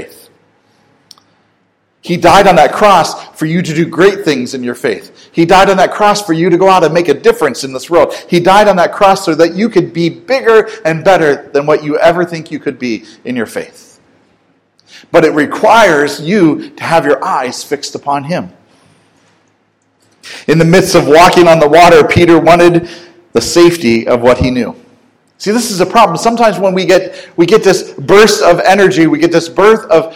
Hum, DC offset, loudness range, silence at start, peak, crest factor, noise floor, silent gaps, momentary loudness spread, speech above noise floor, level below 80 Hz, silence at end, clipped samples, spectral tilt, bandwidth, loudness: none; under 0.1%; 9 LU; 0 s; 0 dBFS; 10 dB; -57 dBFS; none; 13 LU; 48 dB; -38 dBFS; 0 s; 5%; -5 dB/octave; 18 kHz; -9 LUFS